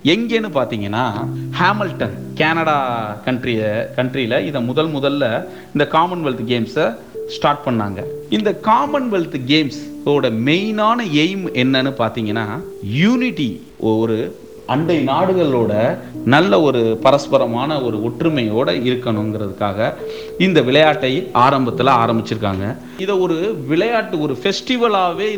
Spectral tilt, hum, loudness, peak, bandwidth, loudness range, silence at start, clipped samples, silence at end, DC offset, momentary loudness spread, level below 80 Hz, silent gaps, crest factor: -6.5 dB/octave; none; -17 LUFS; 0 dBFS; over 20 kHz; 3 LU; 0.05 s; under 0.1%; 0 s; 0.4%; 9 LU; -54 dBFS; none; 16 dB